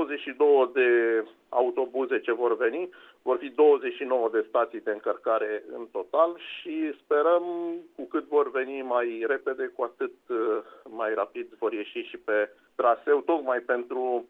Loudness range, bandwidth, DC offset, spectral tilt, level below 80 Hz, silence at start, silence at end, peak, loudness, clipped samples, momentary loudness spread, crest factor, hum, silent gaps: 5 LU; 3.9 kHz; under 0.1%; -6 dB/octave; -78 dBFS; 0 s; 0.05 s; -10 dBFS; -27 LUFS; under 0.1%; 12 LU; 18 dB; none; none